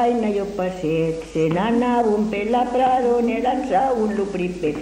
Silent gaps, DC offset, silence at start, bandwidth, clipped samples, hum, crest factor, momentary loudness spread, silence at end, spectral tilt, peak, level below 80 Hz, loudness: none; under 0.1%; 0 s; 11 kHz; under 0.1%; none; 14 dB; 5 LU; 0 s; -7 dB/octave; -6 dBFS; -46 dBFS; -20 LUFS